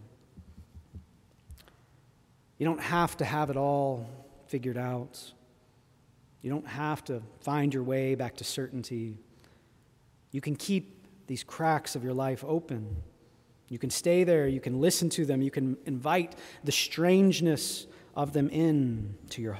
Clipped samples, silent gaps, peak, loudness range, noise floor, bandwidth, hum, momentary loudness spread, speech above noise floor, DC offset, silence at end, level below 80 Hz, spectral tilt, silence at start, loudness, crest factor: under 0.1%; none; -12 dBFS; 8 LU; -63 dBFS; 16 kHz; none; 15 LU; 34 dB; under 0.1%; 0 s; -58 dBFS; -5 dB/octave; 0 s; -30 LUFS; 18 dB